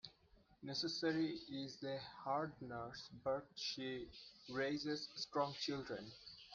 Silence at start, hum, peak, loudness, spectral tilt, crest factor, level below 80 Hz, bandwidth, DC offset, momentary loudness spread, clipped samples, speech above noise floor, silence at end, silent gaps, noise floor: 0.05 s; none; -26 dBFS; -44 LUFS; -4.5 dB/octave; 20 dB; -74 dBFS; 7.4 kHz; under 0.1%; 12 LU; under 0.1%; 27 dB; 0 s; none; -71 dBFS